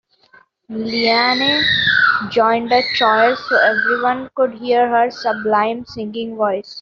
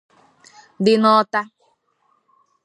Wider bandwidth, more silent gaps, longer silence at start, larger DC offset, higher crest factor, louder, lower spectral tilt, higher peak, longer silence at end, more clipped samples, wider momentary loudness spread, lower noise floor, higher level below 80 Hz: second, 7.2 kHz vs 11 kHz; neither; about the same, 0.7 s vs 0.8 s; neither; second, 14 dB vs 20 dB; about the same, -15 LUFS vs -17 LUFS; second, -0.5 dB/octave vs -6 dB/octave; about the same, -2 dBFS vs -2 dBFS; second, 0 s vs 1.2 s; neither; second, 9 LU vs 12 LU; second, -51 dBFS vs -65 dBFS; first, -56 dBFS vs -70 dBFS